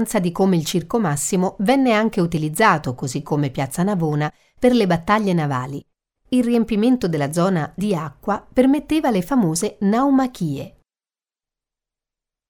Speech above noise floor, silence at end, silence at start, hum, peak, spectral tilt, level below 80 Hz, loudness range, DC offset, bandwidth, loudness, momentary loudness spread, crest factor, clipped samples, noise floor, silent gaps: over 71 dB; 1.8 s; 0 s; none; -2 dBFS; -6 dB/octave; -48 dBFS; 2 LU; under 0.1%; 18 kHz; -19 LUFS; 9 LU; 18 dB; under 0.1%; under -90 dBFS; none